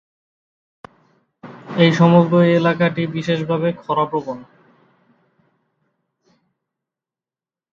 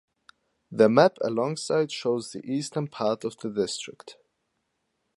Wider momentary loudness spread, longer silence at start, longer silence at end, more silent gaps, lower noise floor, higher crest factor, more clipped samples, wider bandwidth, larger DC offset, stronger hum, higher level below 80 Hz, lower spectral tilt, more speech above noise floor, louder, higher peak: first, 15 LU vs 12 LU; first, 1.45 s vs 0.7 s; first, 3.3 s vs 1.05 s; neither; first, under -90 dBFS vs -77 dBFS; about the same, 20 dB vs 24 dB; neither; second, 7 kHz vs 11.5 kHz; neither; neither; first, -64 dBFS vs -72 dBFS; first, -7.5 dB/octave vs -5 dB/octave; first, over 74 dB vs 52 dB; first, -17 LUFS vs -26 LUFS; first, 0 dBFS vs -4 dBFS